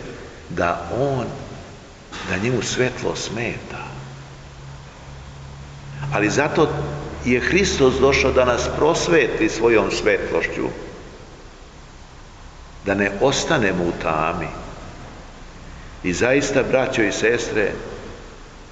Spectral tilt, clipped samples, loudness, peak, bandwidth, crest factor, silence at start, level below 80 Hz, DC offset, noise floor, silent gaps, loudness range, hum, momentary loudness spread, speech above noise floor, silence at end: -4.5 dB/octave; under 0.1%; -20 LUFS; -2 dBFS; 9 kHz; 20 dB; 0 s; -40 dBFS; under 0.1%; -41 dBFS; none; 8 LU; none; 22 LU; 22 dB; 0 s